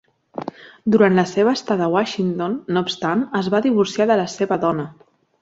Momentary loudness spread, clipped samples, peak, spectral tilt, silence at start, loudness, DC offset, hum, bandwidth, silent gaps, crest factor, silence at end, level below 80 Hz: 16 LU; under 0.1%; -2 dBFS; -6 dB/octave; 0.4 s; -19 LUFS; under 0.1%; none; 8 kHz; none; 18 dB; 0.5 s; -60 dBFS